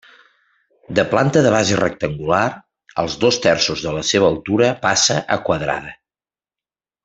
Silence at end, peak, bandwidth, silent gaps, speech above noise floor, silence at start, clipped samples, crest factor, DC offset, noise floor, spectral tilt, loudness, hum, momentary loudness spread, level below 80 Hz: 1.1 s; -2 dBFS; 8.4 kHz; none; over 73 dB; 0.9 s; under 0.1%; 18 dB; under 0.1%; under -90 dBFS; -4 dB/octave; -17 LUFS; none; 9 LU; -50 dBFS